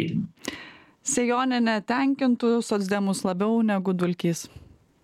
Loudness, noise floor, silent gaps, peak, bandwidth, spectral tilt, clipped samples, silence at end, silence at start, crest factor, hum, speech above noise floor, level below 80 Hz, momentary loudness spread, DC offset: -25 LUFS; -46 dBFS; none; -12 dBFS; 15 kHz; -5 dB/octave; under 0.1%; 0.45 s; 0 s; 14 dB; none; 23 dB; -64 dBFS; 11 LU; under 0.1%